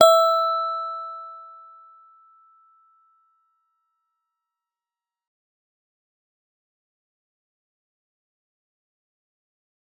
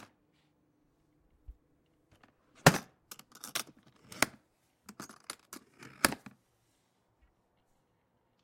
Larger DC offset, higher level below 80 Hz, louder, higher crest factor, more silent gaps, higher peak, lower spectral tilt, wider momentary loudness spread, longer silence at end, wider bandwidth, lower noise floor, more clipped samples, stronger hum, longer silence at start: neither; second, -88 dBFS vs -62 dBFS; first, -21 LUFS vs -31 LUFS; second, 26 dB vs 32 dB; neither; first, -2 dBFS vs -6 dBFS; second, -0.5 dB/octave vs -3.5 dB/octave; about the same, 27 LU vs 26 LU; first, 8.55 s vs 2.3 s; first, over 20 kHz vs 16.5 kHz; first, under -90 dBFS vs -75 dBFS; neither; neither; second, 0 s vs 1.5 s